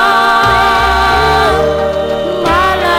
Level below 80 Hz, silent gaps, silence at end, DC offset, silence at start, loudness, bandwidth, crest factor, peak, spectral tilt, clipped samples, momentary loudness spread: -26 dBFS; none; 0 s; 0.2%; 0 s; -10 LUFS; 19 kHz; 10 dB; 0 dBFS; -4.5 dB/octave; under 0.1%; 6 LU